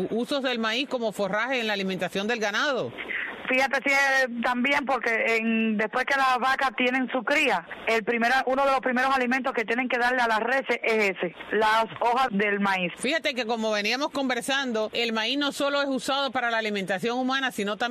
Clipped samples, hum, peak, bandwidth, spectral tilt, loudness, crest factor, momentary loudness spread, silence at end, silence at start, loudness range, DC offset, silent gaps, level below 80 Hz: under 0.1%; none; -12 dBFS; 14 kHz; -3.5 dB/octave; -25 LUFS; 12 dB; 5 LU; 0 s; 0 s; 3 LU; under 0.1%; none; -64 dBFS